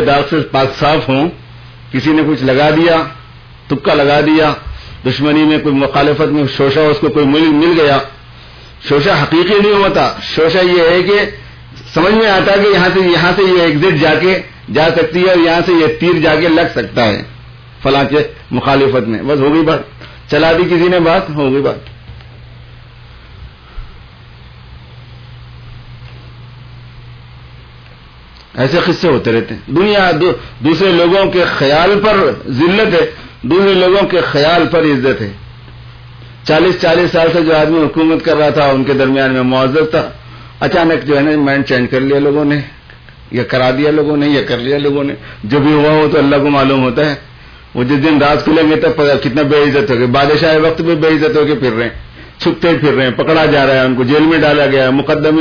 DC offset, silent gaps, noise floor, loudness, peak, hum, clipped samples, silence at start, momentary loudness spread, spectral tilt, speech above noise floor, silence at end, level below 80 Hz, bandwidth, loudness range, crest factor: under 0.1%; none; -37 dBFS; -11 LUFS; 0 dBFS; none; under 0.1%; 0 s; 8 LU; -7 dB/octave; 27 dB; 0 s; -38 dBFS; 5.4 kHz; 3 LU; 12 dB